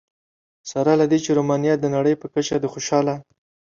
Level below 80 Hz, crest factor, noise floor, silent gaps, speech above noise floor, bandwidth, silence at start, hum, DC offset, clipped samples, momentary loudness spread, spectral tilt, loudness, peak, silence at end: -60 dBFS; 16 dB; under -90 dBFS; none; over 70 dB; 7.6 kHz; 0.65 s; none; under 0.1%; under 0.1%; 8 LU; -5.5 dB/octave; -20 LUFS; -4 dBFS; 0.55 s